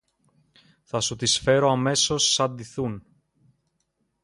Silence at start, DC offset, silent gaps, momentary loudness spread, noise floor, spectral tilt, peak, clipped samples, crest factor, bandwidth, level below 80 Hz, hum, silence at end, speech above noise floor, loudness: 0.95 s; under 0.1%; none; 12 LU; -74 dBFS; -3 dB/octave; -8 dBFS; under 0.1%; 18 dB; 11.5 kHz; -56 dBFS; none; 1.25 s; 51 dB; -22 LUFS